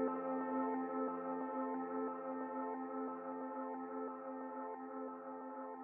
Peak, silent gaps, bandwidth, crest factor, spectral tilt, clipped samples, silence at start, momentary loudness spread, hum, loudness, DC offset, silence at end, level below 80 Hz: -28 dBFS; none; 3.1 kHz; 16 dB; -0.5 dB/octave; under 0.1%; 0 s; 8 LU; none; -43 LUFS; under 0.1%; 0 s; under -90 dBFS